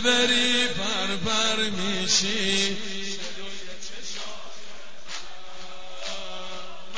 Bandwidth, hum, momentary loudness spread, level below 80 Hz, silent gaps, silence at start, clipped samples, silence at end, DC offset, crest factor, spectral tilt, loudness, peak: 8 kHz; none; 21 LU; -58 dBFS; none; 0 s; under 0.1%; 0 s; 3%; 22 dB; -1.5 dB/octave; -24 LUFS; -6 dBFS